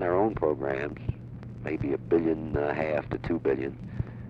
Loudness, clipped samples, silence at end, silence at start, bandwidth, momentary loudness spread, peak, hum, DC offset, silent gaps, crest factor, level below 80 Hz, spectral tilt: -29 LUFS; under 0.1%; 0 s; 0 s; 6.4 kHz; 11 LU; -12 dBFS; none; under 0.1%; none; 18 dB; -46 dBFS; -9.5 dB/octave